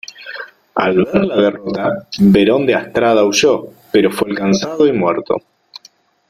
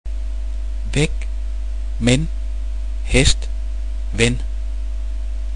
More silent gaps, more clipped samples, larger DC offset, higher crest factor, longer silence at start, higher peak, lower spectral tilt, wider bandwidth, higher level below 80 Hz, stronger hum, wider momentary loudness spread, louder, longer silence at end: neither; neither; second, under 0.1% vs 3%; second, 14 dB vs 20 dB; first, 0.2 s vs 0.05 s; about the same, 0 dBFS vs 0 dBFS; about the same, -5.5 dB/octave vs -4.5 dB/octave; first, 14.5 kHz vs 10.5 kHz; second, -48 dBFS vs -22 dBFS; neither; about the same, 10 LU vs 11 LU; first, -14 LUFS vs -22 LUFS; first, 0.9 s vs 0 s